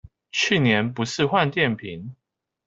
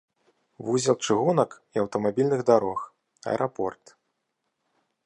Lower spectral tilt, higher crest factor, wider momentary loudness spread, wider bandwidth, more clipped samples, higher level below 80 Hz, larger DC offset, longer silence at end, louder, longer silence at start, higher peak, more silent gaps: about the same, -5 dB/octave vs -5.5 dB/octave; about the same, 20 dB vs 20 dB; first, 16 LU vs 13 LU; second, 8 kHz vs 11 kHz; neither; first, -58 dBFS vs -68 dBFS; neither; second, 0.55 s vs 1.3 s; first, -22 LUFS vs -25 LUFS; second, 0.35 s vs 0.6 s; about the same, -4 dBFS vs -6 dBFS; neither